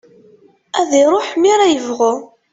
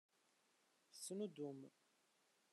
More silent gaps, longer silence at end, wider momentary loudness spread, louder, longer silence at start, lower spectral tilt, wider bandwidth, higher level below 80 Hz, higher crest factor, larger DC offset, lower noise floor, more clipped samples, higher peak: neither; second, 0.3 s vs 0.85 s; second, 9 LU vs 16 LU; first, -14 LUFS vs -51 LUFS; second, 0.75 s vs 0.9 s; second, -2.5 dB/octave vs -5 dB/octave; second, 8.2 kHz vs 12.5 kHz; first, -62 dBFS vs under -90 dBFS; second, 14 dB vs 20 dB; neither; second, -49 dBFS vs -81 dBFS; neither; first, -2 dBFS vs -36 dBFS